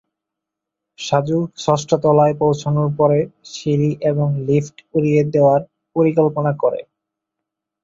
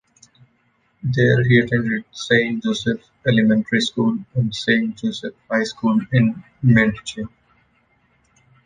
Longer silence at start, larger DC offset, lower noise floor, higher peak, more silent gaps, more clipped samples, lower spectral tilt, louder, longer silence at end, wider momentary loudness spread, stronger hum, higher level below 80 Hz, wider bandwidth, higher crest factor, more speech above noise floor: about the same, 1 s vs 1.05 s; neither; first, -83 dBFS vs -63 dBFS; about the same, -2 dBFS vs -2 dBFS; neither; neither; about the same, -7.5 dB/octave vs -6.5 dB/octave; about the same, -18 LUFS vs -19 LUFS; second, 1 s vs 1.4 s; second, 7 LU vs 10 LU; first, 50 Hz at -60 dBFS vs none; about the same, -56 dBFS vs -52 dBFS; second, 7.8 kHz vs 9.4 kHz; about the same, 16 dB vs 18 dB; first, 66 dB vs 45 dB